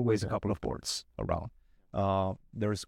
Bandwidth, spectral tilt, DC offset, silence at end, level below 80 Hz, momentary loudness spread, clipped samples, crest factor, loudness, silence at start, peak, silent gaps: 15.5 kHz; -5.5 dB/octave; under 0.1%; 0 s; -50 dBFS; 6 LU; under 0.1%; 16 dB; -33 LUFS; 0 s; -16 dBFS; none